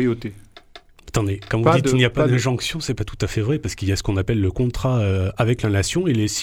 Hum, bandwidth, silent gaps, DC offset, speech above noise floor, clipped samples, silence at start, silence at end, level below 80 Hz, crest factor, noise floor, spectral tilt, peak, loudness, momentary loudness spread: none; 16 kHz; none; under 0.1%; 26 dB; under 0.1%; 0 s; 0 s; -38 dBFS; 18 dB; -46 dBFS; -5.5 dB/octave; -2 dBFS; -21 LUFS; 8 LU